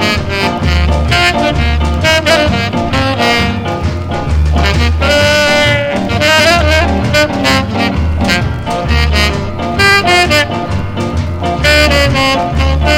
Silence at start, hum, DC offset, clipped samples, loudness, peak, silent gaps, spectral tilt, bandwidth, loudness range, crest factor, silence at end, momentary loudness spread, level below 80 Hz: 0 s; none; under 0.1%; 0.2%; -11 LUFS; 0 dBFS; none; -4.5 dB/octave; 16 kHz; 2 LU; 10 dB; 0 s; 9 LU; -18 dBFS